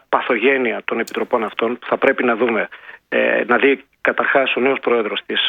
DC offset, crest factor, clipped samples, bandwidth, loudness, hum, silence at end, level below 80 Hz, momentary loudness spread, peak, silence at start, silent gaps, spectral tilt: under 0.1%; 18 dB; under 0.1%; 17 kHz; -18 LUFS; none; 0 s; -66 dBFS; 7 LU; 0 dBFS; 0.1 s; none; -4.5 dB/octave